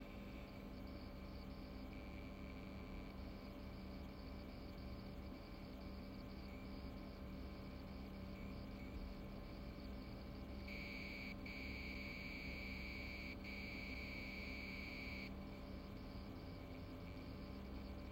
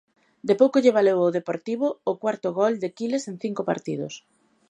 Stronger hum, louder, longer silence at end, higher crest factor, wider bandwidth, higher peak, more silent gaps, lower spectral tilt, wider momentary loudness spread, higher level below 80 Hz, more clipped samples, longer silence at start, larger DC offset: neither; second, -52 LUFS vs -24 LUFS; second, 0 s vs 0.5 s; second, 14 dB vs 20 dB; first, 16 kHz vs 9.8 kHz; second, -38 dBFS vs -4 dBFS; neither; about the same, -6.5 dB/octave vs -6 dB/octave; second, 5 LU vs 13 LU; first, -56 dBFS vs -76 dBFS; neither; second, 0 s vs 0.45 s; neither